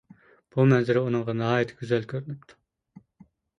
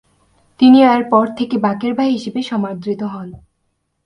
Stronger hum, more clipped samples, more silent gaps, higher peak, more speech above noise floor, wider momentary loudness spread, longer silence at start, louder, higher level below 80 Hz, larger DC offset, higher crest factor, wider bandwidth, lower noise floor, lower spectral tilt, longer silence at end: neither; neither; neither; second, -8 dBFS vs 0 dBFS; second, 33 dB vs 54 dB; about the same, 14 LU vs 14 LU; about the same, 0.55 s vs 0.6 s; second, -25 LUFS vs -15 LUFS; second, -64 dBFS vs -56 dBFS; neither; about the same, 18 dB vs 16 dB; second, 7.4 kHz vs 9.8 kHz; second, -58 dBFS vs -68 dBFS; about the same, -8 dB/octave vs -7 dB/octave; first, 1.2 s vs 0.65 s